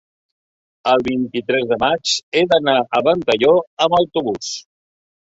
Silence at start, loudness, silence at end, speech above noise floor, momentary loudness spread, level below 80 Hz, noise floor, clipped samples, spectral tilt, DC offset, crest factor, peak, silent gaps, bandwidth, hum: 0.85 s; -17 LUFS; 0.65 s; over 73 dB; 9 LU; -54 dBFS; under -90 dBFS; under 0.1%; -3.5 dB/octave; under 0.1%; 16 dB; -2 dBFS; 2.23-2.32 s, 3.67-3.77 s; 8 kHz; none